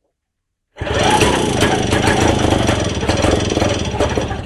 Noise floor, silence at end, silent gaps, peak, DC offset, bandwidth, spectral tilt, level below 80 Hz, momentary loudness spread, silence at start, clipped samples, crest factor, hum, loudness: -75 dBFS; 0 s; none; -2 dBFS; under 0.1%; 13.5 kHz; -4.5 dB/octave; -28 dBFS; 5 LU; 0.75 s; under 0.1%; 14 dB; none; -15 LUFS